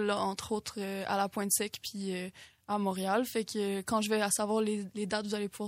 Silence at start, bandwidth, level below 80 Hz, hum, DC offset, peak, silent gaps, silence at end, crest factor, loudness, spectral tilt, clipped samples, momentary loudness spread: 0 s; 16 kHz; -68 dBFS; none; under 0.1%; -14 dBFS; none; 0 s; 18 dB; -33 LUFS; -3.5 dB/octave; under 0.1%; 8 LU